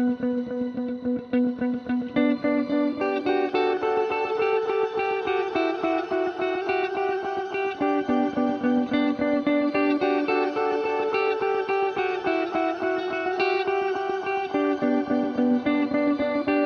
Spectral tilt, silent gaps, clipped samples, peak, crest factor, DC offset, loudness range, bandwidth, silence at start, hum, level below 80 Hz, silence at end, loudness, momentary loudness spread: -6.5 dB/octave; none; under 0.1%; -12 dBFS; 14 dB; under 0.1%; 2 LU; 6.6 kHz; 0 s; none; -62 dBFS; 0 s; -25 LUFS; 4 LU